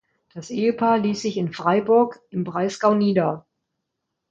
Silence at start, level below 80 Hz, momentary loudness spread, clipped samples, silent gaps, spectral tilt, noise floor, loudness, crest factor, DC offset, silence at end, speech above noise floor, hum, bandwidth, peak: 0.35 s; -66 dBFS; 13 LU; under 0.1%; none; -6.5 dB/octave; -80 dBFS; -21 LUFS; 16 dB; under 0.1%; 0.9 s; 59 dB; none; 8 kHz; -6 dBFS